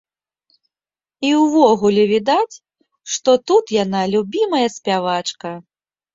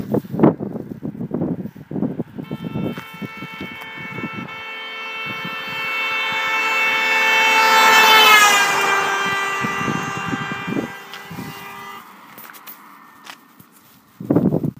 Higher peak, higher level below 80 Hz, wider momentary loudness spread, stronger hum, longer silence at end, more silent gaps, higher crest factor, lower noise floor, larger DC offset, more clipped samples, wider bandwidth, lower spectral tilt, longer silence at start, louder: about the same, -2 dBFS vs 0 dBFS; second, -62 dBFS vs -56 dBFS; second, 12 LU vs 23 LU; neither; first, 0.55 s vs 0.05 s; neither; about the same, 16 dB vs 20 dB; first, under -90 dBFS vs -50 dBFS; neither; neither; second, 7.8 kHz vs 15.5 kHz; first, -4.5 dB/octave vs -3 dB/octave; first, 1.2 s vs 0 s; about the same, -17 LUFS vs -16 LUFS